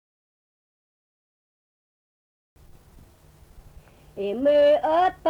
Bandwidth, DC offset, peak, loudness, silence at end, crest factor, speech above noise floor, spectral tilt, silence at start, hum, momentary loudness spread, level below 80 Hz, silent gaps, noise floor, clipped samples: 6.6 kHz; under 0.1%; -12 dBFS; -21 LUFS; 0 s; 16 dB; 33 dB; -6 dB/octave; 4.15 s; none; 15 LU; -56 dBFS; none; -53 dBFS; under 0.1%